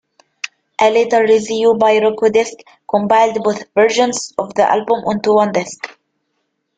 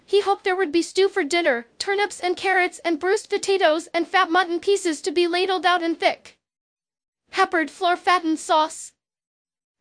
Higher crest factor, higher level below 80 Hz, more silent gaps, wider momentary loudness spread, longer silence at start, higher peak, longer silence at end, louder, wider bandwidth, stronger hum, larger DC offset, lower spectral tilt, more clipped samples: about the same, 14 dB vs 18 dB; first, -60 dBFS vs -68 dBFS; second, none vs 6.61-6.77 s, 7.08-7.13 s; first, 14 LU vs 5 LU; first, 0.45 s vs 0.1 s; about the same, -2 dBFS vs -4 dBFS; about the same, 0.9 s vs 0.95 s; first, -14 LUFS vs -21 LUFS; second, 9.2 kHz vs 10.5 kHz; neither; neither; first, -4 dB/octave vs -1.5 dB/octave; neither